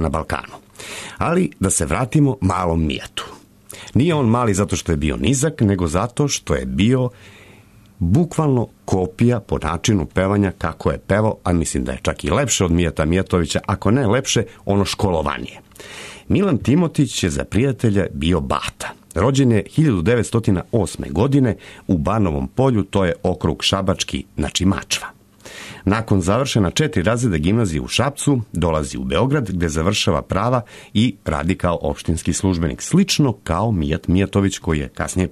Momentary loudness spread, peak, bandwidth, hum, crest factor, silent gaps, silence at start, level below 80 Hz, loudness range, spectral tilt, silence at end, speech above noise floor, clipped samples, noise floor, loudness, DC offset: 7 LU; -4 dBFS; 13.5 kHz; none; 14 dB; none; 0 s; -34 dBFS; 2 LU; -5.5 dB/octave; 0 s; 28 dB; under 0.1%; -47 dBFS; -19 LUFS; under 0.1%